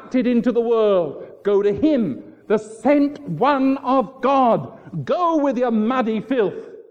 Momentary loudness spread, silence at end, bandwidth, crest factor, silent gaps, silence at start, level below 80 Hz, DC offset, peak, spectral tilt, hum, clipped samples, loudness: 8 LU; 0.1 s; 9.6 kHz; 14 dB; none; 0 s; -58 dBFS; under 0.1%; -4 dBFS; -7.5 dB/octave; none; under 0.1%; -19 LUFS